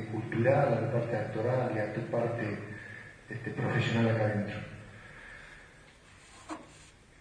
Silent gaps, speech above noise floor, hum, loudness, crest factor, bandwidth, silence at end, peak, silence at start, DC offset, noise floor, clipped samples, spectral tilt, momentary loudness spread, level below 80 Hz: none; 26 dB; none; -31 LUFS; 20 dB; 10.5 kHz; 0.3 s; -12 dBFS; 0 s; under 0.1%; -56 dBFS; under 0.1%; -7.5 dB/octave; 21 LU; -62 dBFS